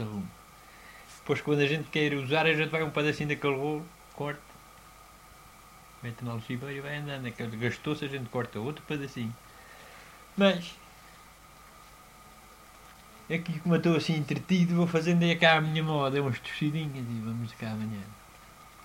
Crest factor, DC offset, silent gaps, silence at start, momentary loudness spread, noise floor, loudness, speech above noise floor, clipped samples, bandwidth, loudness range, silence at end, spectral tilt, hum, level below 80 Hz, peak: 24 dB; under 0.1%; none; 0 s; 22 LU; -53 dBFS; -29 LUFS; 24 dB; under 0.1%; 16 kHz; 11 LU; 0 s; -6 dB/octave; none; -62 dBFS; -6 dBFS